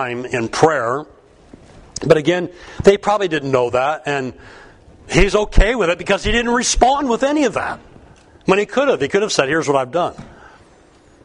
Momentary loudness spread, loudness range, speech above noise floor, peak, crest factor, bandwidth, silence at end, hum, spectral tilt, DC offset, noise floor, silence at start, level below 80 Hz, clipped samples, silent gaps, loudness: 9 LU; 2 LU; 32 dB; 0 dBFS; 18 dB; 11 kHz; 0.95 s; none; -4.5 dB/octave; under 0.1%; -48 dBFS; 0 s; -28 dBFS; under 0.1%; none; -17 LUFS